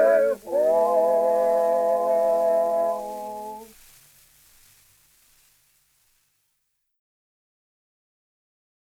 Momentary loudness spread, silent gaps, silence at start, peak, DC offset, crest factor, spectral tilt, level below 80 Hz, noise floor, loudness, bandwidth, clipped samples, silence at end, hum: 14 LU; none; 0 s; -10 dBFS; under 0.1%; 16 dB; -4.5 dB/octave; -66 dBFS; -75 dBFS; -22 LUFS; 17.5 kHz; under 0.1%; 5.2 s; 50 Hz at -70 dBFS